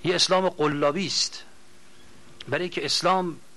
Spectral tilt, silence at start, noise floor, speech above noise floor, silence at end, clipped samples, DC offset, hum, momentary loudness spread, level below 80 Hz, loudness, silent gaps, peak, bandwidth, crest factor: -3 dB/octave; 0.05 s; -55 dBFS; 30 dB; 0.2 s; under 0.1%; 0.6%; none; 9 LU; -66 dBFS; -24 LUFS; none; -8 dBFS; 13 kHz; 18 dB